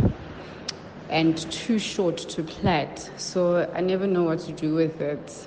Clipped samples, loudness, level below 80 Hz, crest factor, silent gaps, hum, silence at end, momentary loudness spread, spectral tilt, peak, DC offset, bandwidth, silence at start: under 0.1%; -26 LUFS; -46 dBFS; 16 dB; none; none; 0 s; 12 LU; -5.5 dB/octave; -10 dBFS; under 0.1%; 9.6 kHz; 0 s